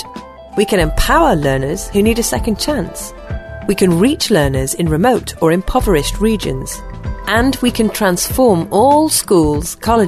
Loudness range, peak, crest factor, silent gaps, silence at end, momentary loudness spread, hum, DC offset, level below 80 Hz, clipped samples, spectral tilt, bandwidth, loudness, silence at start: 2 LU; 0 dBFS; 14 dB; none; 0 s; 13 LU; none; under 0.1%; -26 dBFS; under 0.1%; -4.5 dB/octave; 14 kHz; -14 LUFS; 0 s